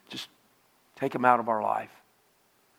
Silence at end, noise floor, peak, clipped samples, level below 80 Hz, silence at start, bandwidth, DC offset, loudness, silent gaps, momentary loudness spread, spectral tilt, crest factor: 0.9 s; -66 dBFS; -6 dBFS; under 0.1%; -80 dBFS; 0.1 s; 16.5 kHz; under 0.1%; -27 LUFS; none; 20 LU; -5.5 dB/octave; 24 dB